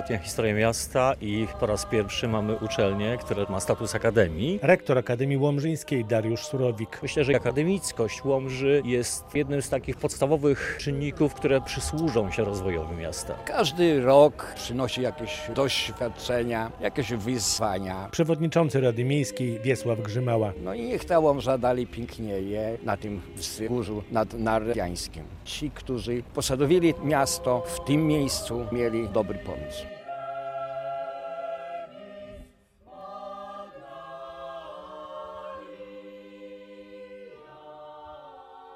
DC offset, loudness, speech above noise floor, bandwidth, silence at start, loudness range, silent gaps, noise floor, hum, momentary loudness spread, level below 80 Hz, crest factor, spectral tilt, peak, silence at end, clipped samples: under 0.1%; -26 LUFS; 29 dB; 16 kHz; 0 s; 16 LU; none; -55 dBFS; none; 19 LU; -48 dBFS; 22 dB; -5 dB/octave; -6 dBFS; 0 s; under 0.1%